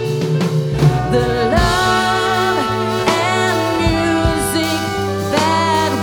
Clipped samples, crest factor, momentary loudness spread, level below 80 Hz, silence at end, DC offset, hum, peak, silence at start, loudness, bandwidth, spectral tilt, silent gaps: under 0.1%; 14 dB; 4 LU; -30 dBFS; 0 s; under 0.1%; none; -2 dBFS; 0 s; -16 LUFS; over 20 kHz; -5 dB/octave; none